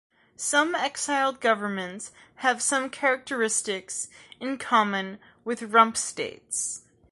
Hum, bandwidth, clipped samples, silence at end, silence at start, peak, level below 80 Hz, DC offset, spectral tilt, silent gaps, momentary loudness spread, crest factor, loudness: none; 11.5 kHz; under 0.1%; 0.3 s; 0.4 s; -4 dBFS; -72 dBFS; under 0.1%; -2 dB/octave; none; 13 LU; 24 dB; -26 LUFS